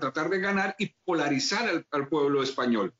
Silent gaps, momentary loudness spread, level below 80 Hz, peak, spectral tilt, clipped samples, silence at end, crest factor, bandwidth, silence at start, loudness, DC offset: none; 4 LU; -70 dBFS; -16 dBFS; -3 dB/octave; under 0.1%; 0.1 s; 12 dB; 8 kHz; 0 s; -27 LUFS; under 0.1%